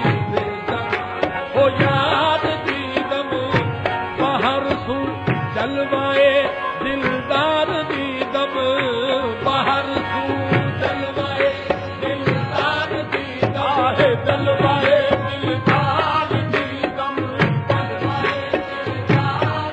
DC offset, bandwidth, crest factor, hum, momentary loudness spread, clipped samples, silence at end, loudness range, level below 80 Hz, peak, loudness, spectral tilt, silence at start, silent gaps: under 0.1%; 8.6 kHz; 14 dB; none; 7 LU; under 0.1%; 0 s; 3 LU; -48 dBFS; -4 dBFS; -19 LUFS; -7 dB/octave; 0 s; none